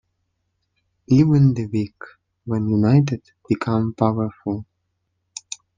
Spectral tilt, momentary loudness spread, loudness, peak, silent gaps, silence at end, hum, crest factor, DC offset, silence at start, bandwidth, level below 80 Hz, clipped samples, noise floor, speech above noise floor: -8 dB/octave; 18 LU; -20 LUFS; -2 dBFS; none; 1.15 s; none; 18 dB; under 0.1%; 1.1 s; 9.4 kHz; -54 dBFS; under 0.1%; -73 dBFS; 54 dB